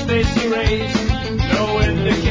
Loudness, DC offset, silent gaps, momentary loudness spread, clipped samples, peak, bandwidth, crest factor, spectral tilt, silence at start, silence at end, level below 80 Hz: -18 LUFS; under 0.1%; none; 3 LU; under 0.1%; -2 dBFS; 7.6 kHz; 16 dB; -6 dB/octave; 0 s; 0 s; -24 dBFS